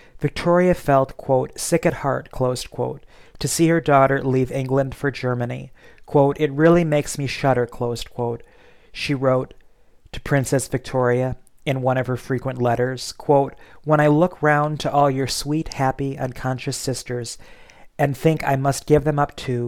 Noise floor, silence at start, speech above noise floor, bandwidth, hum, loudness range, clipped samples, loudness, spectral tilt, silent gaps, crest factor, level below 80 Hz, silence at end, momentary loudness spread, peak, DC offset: -52 dBFS; 0.15 s; 32 dB; 16.5 kHz; none; 4 LU; under 0.1%; -21 LUFS; -6 dB/octave; none; 18 dB; -44 dBFS; 0 s; 11 LU; -4 dBFS; 0.2%